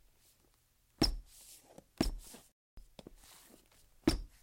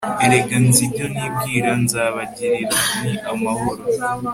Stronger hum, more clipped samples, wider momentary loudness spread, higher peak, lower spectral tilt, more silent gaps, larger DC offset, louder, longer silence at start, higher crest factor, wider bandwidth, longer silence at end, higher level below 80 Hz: neither; neither; first, 24 LU vs 9 LU; second, -16 dBFS vs 0 dBFS; about the same, -4.5 dB/octave vs -4 dB/octave; first, 2.52-2.77 s vs none; neither; second, -37 LUFS vs -18 LUFS; first, 1 s vs 0 s; first, 26 dB vs 18 dB; about the same, 16.5 kHz vs 16.5 kHz; first, 0.15 s vs 0 s; about the same, -48 dBFS vs -50 dBFS